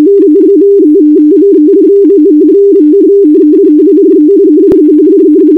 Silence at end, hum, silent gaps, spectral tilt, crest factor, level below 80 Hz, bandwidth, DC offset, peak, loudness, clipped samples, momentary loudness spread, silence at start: 0 s; none; none; -9.5 dB/octave; 4 dB; -48 dBFS; 1.6 kHz; 0.5%; 0 dBFS; -4 LUFS; 5%; 0 LU; 0 s